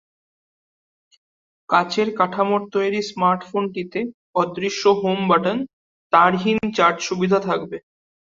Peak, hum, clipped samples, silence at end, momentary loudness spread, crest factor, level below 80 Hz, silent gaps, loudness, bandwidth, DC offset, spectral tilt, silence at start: -2 dBFS; none; under 0.1%; 0.6 s; 9 LU; 20 dB; -62 dBFS; 4.14-4.33 s, 5.73-6.10 s; -20 LUFS; 7.6 kHz; under 0.1%; -5 dB/octave; 1.7 s